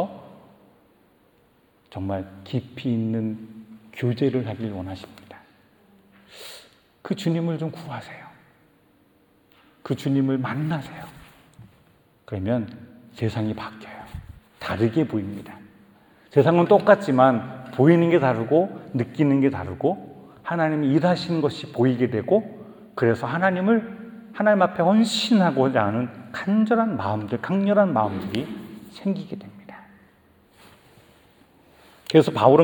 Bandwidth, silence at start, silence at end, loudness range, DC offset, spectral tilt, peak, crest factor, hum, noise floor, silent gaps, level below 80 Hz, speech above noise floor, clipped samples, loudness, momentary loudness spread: 19 kHz; 0 s; 0 s; 12 LU; under 0.1%; -7 dB/octave; -2 dBFS; 22 dB; none; -60 dBFS; none; -60 dBFS; 39 dB; under 0.1%; -22 LUFS; 22 LU